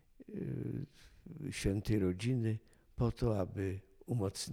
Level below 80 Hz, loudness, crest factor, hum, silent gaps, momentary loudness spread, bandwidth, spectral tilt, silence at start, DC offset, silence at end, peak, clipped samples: -52 dBFS; -38 LUFS; 16 dB; none; none; 14 LU; 16 kHz; -6.5 dB/octave; 0.2 s; under 0.1%; 0 s; -20 dBFS; under 0.1%